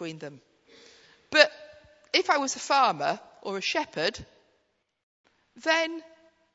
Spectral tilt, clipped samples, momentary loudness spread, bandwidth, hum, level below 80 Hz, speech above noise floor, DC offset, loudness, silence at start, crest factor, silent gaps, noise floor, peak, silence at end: -2 dB/octave; under 0.1%; 18 LU; 8 kHz; none; -68 dBFS; 45 dB; under 0.1%; -26 LUFS; 0 s; 28 dB; 5.03-5.24 s; -73 dBFS; -2 dBFS; 0.55 s